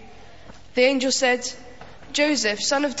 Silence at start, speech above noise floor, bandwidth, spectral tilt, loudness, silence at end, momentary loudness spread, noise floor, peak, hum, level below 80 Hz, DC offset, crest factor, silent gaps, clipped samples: 0 s; 25 dB; 8 kHz; -1.5 dB/octave; -21 LUFS; 0 s; 10 LU; -46 dBFS; -6 dBFS; none; -56 dBFS; 0.7%; 18 dB; none; under 0.1%